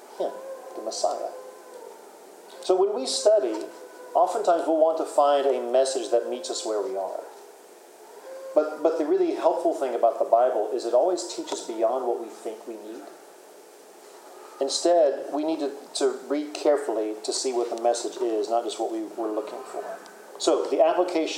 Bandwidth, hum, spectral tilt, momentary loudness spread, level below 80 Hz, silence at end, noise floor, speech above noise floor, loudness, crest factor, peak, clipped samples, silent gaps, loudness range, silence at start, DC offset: 16 kHz; none; -2 dB/octave; 19 LU; under -90 dBFS; 0 s; -49 dBFS; 24 dB; -25 LUFS; 20 dB; -6 dBFS; under 0.1%; none; 5 LU; 0 s; under 0.1%